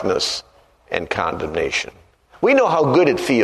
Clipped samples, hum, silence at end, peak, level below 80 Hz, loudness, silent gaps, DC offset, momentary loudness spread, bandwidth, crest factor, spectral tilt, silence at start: under 0.1%; none; 0 s; 0 dBFS; -48 dBFS; -19 LUFS; none; under 0.1%; 12 LU; 13.5 kHz; 18 dB; -4.5 dB/octave; 0 s